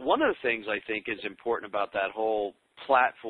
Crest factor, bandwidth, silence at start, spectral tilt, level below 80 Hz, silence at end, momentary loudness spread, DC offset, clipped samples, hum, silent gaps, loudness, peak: 20 dB; 4.6 kHz; 0 s; -6.5 dB/octave; -66 dBFS; 0 s; 9 LU; under 0.1%; under 0.1%; none; none; -29 LUFS; -8 dBFS